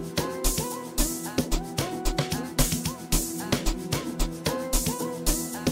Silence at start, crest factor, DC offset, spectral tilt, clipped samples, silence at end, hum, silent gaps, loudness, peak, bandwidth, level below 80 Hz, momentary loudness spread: 0 s; 20 dB; under 0.1%; -3.5 dB/octave; under 0.1%; 0 s; none; none; -28 LUFS; -8 dBFS; 16.5 kHz; -32 dBFS; 4 LU